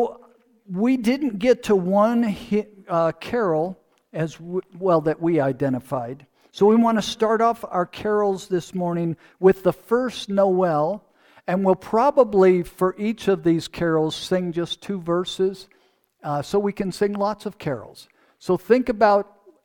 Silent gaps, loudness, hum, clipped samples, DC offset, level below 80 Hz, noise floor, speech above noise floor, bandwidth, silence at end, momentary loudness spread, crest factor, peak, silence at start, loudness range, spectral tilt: none; -22 LUFS; none; under 0.1%; under 0.1%; -56 dBFS; -62 dBFS; 41 dB; 18.5 kHz; 0.4 s; 11 LU; 18 dB; -4 dBFS; 0 s; 5 LU; -6.5 dB/octave